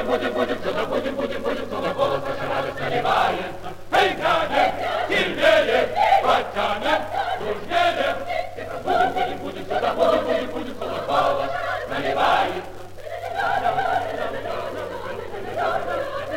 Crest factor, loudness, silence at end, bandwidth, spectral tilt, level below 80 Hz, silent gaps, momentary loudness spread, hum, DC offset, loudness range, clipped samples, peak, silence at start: 18 dB; -23 LUFS; 0 s; 16.5 kHz; -4.5 dB/octave; -48 dBFS; none; 12 LU; none; under 0.1%; 5 LU; under 0.1%; -6 dBFS; 0 s